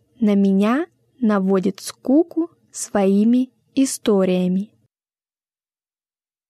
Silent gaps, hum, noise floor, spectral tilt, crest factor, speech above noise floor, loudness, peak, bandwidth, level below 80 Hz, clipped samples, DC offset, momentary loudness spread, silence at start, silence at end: none; none; under -90 dBFS; -6.5 dB/octave; 14 dB; over 72 dB; -19 LUFS; -6 dBFS; 13.5 kHz; -66 dBFS; under 0.1%; under 0.1%; 11 LU; 0.2 s; 1.85 s